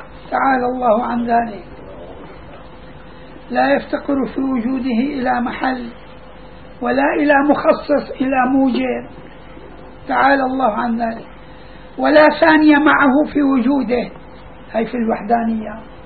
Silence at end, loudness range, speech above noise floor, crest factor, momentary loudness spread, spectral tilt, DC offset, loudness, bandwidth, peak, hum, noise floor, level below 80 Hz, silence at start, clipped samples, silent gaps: 0 s; 7 LU; 23 dB; 16 dB; 21 LU; -9 dB/octave; 0.9%; -16 LUFS; 4.7 kHz; 0 dBFS; none; -38 dBFS; -44 dBFS; 0 s; under 0.1%; none